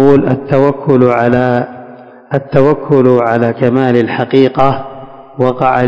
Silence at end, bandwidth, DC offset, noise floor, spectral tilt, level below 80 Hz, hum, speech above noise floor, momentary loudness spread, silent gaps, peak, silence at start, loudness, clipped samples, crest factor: 0 s; 8 kHz; under 0.1%; -34 dBFS; -9 dB/octave; -44 dBFS; none; 24 dB; 12 LU; none; 0 dBFS; 0 s; -11 LUFS; 2%; 10 dB